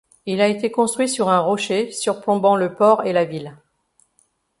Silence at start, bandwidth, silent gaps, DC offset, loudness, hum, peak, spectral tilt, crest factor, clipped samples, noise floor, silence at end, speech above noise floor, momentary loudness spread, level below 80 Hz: 0.25 s; 11.5 kHz; none; under 0.1%; -19 LUFS; none; -2 dBFS; -4.5 dB/octave; 18 dB; under 0.1%; -64 dBFS; 1.05 s; 45 dB; 8 LU; -66 dBFS